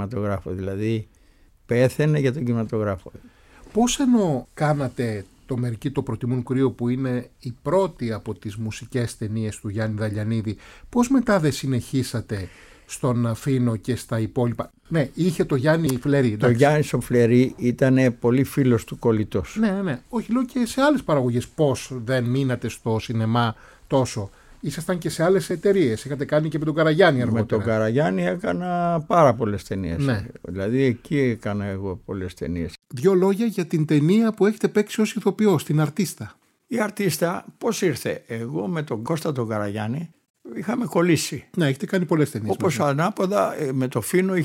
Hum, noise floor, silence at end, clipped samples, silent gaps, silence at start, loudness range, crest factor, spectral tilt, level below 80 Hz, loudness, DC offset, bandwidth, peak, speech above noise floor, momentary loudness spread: none; -55 dBFS; 0 s; under 0.1%; 40.30-40.34 s; 0 s; 5 LU; 18 dB; -6.5 dB/octave; -50 dBFS; -23 LUFS; under 0.1%; 16 kHz; -4 dBFS; 33 dB; 11 LU